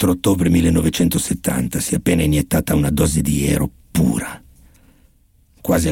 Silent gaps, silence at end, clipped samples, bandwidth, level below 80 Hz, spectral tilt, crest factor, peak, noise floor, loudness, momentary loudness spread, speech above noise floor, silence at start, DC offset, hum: none; 0 s; under 0.1%; 17 kHz; -32 dBFS; -5.5 dB/octave; 12 dB; -6 dBFS; -55 dBFS; -18 LUFS; 6 LU; 38 dB; 0 s; under 0.1%; none